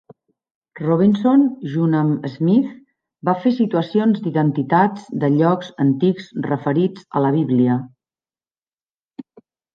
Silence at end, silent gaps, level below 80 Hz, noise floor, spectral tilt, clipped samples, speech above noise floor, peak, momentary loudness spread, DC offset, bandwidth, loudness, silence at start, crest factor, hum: 0.55 s; 8.68-8.72 s, 8.83-8.87 s, 8.95-9.09 s; -66 dBFS; under -90 dBFS; -9.5 dB/octave; under 0.1%; over 73 dB; -2 dBFS; 7 LU; under 0.1%; 6.8 kHz; -18 LUFS; 0.75 s; 16 dB; none